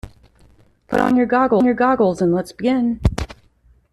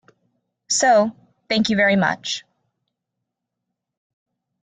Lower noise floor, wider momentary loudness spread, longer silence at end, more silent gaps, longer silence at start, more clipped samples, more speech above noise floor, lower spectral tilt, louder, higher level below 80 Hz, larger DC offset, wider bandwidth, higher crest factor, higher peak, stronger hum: second, -55 dBFS vs -81 dBFS; second, 7 LU vs 11 LU; second, 0.6 s vs 2.25 s; neither; second, 0.05 s vs 0.7 s; neither; second, 38 dB vs 63 dB; first, -7.5 dB/octave vs -3.5 dB/octave; about the same, -17 LUFS vs -19 LUFS; first, -34 dBFS vs -62 dBFS; neither; first, 12.5 kHz vs 9.6 kHz; about the same, 16 dB vs 18 dB; first, -2 dBFS vs -6 dBFS; neither